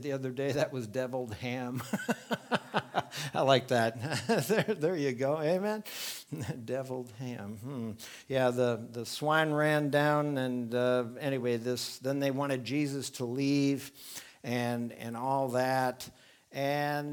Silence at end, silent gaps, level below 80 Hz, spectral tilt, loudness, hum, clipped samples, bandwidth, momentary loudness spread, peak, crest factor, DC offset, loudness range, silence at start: 0 s; none; -74 dBFS; -5.5 dB/octave; -32 LUFS; none; under 0.1%; 19.5 kHz; 12 LU; -8 dBFS; 22 dB; under 0.1%; 5 LU; 0 s